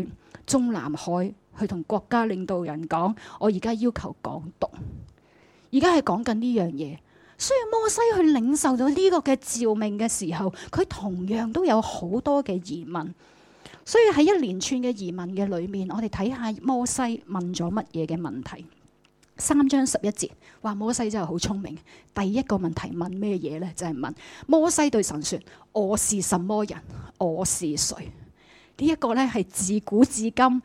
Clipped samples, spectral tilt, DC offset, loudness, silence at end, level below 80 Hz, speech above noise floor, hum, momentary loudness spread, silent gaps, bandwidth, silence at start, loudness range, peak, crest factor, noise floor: under 0.1%; -4.5 dB/octave; under 0.1%; -25 LUFS; 0.05 s; -52 dBFS; 36 dB; none; 13 LU; none; 16 kHz; 0 s; 5 LU; -6 dBFS; 18 dB; -61 dBFS